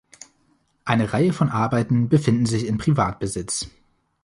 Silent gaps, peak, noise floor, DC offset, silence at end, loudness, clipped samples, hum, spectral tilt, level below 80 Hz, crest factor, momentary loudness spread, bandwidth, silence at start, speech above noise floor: none; -2 dBFS; -64 dBFS; under 0.1%; 0.55 s; -21 LUFS; under 0.1%; none; -6 dB/octave; -48 dBFS; 20 dB; 9 LU; 11.5 kHz; 0.85 s; 44 dB